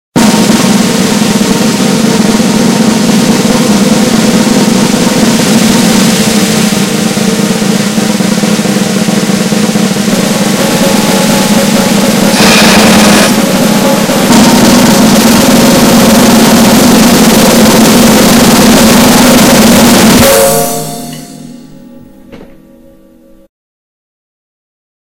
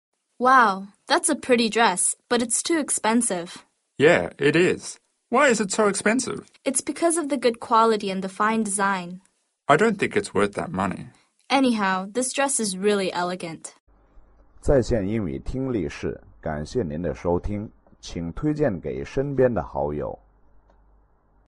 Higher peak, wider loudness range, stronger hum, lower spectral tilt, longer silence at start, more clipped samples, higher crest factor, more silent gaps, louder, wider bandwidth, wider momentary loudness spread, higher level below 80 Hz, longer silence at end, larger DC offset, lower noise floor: first, 0 dBFS vs -4 dBFS; about the same, 5 LU vs 6 LU; neither; about the same, -4 dB/octave vs -4 dB/octave; second, 0.15 s vs 0.4 s; first, 6% vs under 0.1%; second, 6 dB vs 20 dB; second, none vs 13.80-13.87 s; first, -5 LUFS vs -23 LUFS; first, over 20 kHz vs 11.5 kHz; second, 6 LU vs 14 LU; first, -30 dBFS vs -44 dBFS; first, 2.6 s vs 1.35 s; first, 0.5% vs under 0.1%; second, -38 dBFS vs -60 dBFS